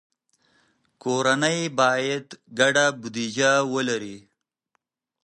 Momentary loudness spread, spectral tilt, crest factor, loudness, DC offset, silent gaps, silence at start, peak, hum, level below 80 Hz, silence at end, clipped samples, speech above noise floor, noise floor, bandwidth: 11 LU; -3 dB/octave; 20 dB; -22 LUFS; under 0.1%; none; 1.05 s; -4 dBFS; none; -74 dBFS; 1.05 s; under 0.1%; 53 dB; -75 dBFS; 11.5 kHz